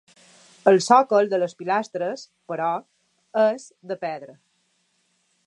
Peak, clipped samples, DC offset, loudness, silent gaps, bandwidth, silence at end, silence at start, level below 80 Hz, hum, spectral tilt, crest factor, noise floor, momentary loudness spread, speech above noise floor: -2 dBFS; under 0.1%; under 0.1%; -22 LUFS; none; 11 kHz; 1.15 s; 0.65 s; -82 dBFS; none; -4.5 dB/octave; 22 dB; -69 dBFS; 18 LU; 47 dB